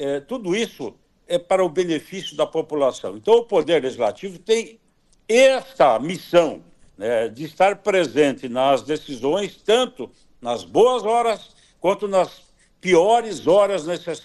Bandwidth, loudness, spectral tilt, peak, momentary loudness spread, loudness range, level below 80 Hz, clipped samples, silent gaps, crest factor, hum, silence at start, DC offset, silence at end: 12.5 kHz; -20 LUFS; -4.5 dB/octave; -4 dBFS; 11 LU; 2 LU; -60 dBFS; under 0.1%; none; 16 dB; none; 0 s; under 0.1%; 0.05 s